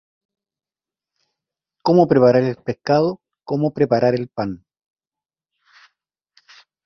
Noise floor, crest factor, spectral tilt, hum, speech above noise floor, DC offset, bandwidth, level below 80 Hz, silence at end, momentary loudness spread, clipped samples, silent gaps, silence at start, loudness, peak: under -90 dBFS; 20 dB; -8.5 dB/octave; none; over 73 dB; under 0.1%; 6.4 kHz; -58 dBFS; 2.3 s; 13 LU; under 0.1%; none; 1.85 s; -18 LUFS; -2 dBFS